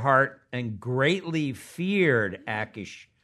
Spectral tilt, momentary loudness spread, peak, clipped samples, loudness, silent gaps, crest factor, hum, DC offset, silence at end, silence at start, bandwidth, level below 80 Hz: -6 dB/octave; 12 LU; -6 dBFS; under 0.1%; -26 LUFS; none; 20 dB; none; under 0.1%; 0.2 s; 0 s; 13 kHz; -68 dBFS